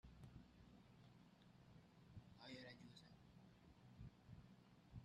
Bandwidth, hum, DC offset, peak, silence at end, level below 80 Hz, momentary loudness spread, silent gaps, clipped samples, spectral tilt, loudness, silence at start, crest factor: 9 kHz; none; under 0.1%; -46 dBFS; 0 s; -74 dBFS; 10 LU; none; under 0.1%; -6 dB/octave; -65 LUFS; 0.05 s; 18 dB